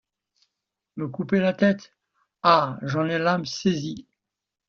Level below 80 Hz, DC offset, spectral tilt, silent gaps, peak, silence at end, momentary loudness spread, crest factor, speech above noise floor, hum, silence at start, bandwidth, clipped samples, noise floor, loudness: -64 dBFS; under 0.1%; -4.5 dB/octave; none; -2 dBFS; 0.65 s; 15 LU; 22 dB; 63 dB; none; 0.95 s; 7.2 kHz; under 0.1%; -86 dBFS; -23 LUFS